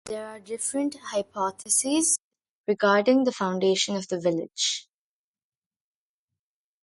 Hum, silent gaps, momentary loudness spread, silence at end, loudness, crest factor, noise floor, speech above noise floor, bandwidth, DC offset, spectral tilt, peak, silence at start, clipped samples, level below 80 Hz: none; 2.19-2.31 s, 2.49-2.64 s; 11 LU; 2 s; -25 LUFS; 20 dB; under -90 dBFS; over 65 dB; 12 kHz; under 0.1%; -3 dB/octave; -8 dBFS; 0.05 s; under 0.1%; -72 dBFS